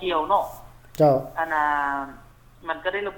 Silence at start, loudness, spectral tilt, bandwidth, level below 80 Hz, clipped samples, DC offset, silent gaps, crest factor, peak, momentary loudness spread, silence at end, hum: 0 s; -23 LUFS; -6 dB/octave; 18 kHz; -52 dBFS; under 0.1%; under 0.1%; none; 16 dB; -8 dBFS; 17 LU; 0 s; none